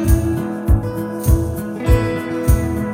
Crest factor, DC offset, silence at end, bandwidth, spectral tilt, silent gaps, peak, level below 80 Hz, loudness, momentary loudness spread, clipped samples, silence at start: 16 dB; under 0.1%; 0 s; 16.5 kHz; -7.5 dB/octave; none; -2 dBFS; -20 dBFS; -19 LUFS; 5 LU; under 0.1%; 0 s